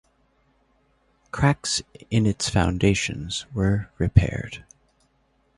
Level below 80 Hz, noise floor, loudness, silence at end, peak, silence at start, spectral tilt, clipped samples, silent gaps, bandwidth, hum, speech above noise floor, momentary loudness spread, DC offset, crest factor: -36 dBFS; -66 dBFS; -23 LUFS; 0.95 s; -2 dBFS; 1.35 s; -5 dB/octave; under 0.1%; none; 11.5 kHz; none; 43 dB; 11 LU; under 0.1%; 24 dB